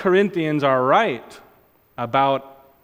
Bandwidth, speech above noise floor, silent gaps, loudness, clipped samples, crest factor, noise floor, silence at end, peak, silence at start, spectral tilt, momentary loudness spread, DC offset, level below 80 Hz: 16 kHz; 37 dB; none; -19 LUFS; under 0.1%; 18 dB; -56 dBFS; 0.35 s; -4 dBFS; 0 s; -7 dB/octave; 11 LU; under 0.1%; -64 dBFS